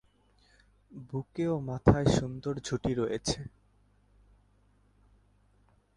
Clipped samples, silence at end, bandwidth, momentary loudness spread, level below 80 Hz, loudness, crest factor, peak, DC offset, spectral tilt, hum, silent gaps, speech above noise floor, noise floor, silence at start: under 0.1%; 2.5 s; 11.5 kHz; 16 LU; -48 dBFS; -31 LUFS; 26 dB; -6 dBFS; under 0.1%; -6 dB/octave; 50 Hz at -55 dBFS; none; 36 dB; -66 dBFS; 0.9 s